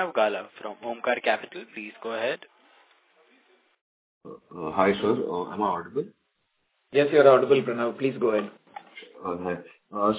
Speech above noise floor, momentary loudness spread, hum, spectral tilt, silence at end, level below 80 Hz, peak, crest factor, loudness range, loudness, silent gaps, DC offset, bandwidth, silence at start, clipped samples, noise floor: 49 dB; 20 LU; none; -9.5 dB/octave; 0 s; -66 dBFS; -4 dBFS; 22 dB; 9 LU; -25 LUFS; 3.81-4.21 s; under 0.1%; 4 kHz; 0 s; under 0.1%; -74 dBFS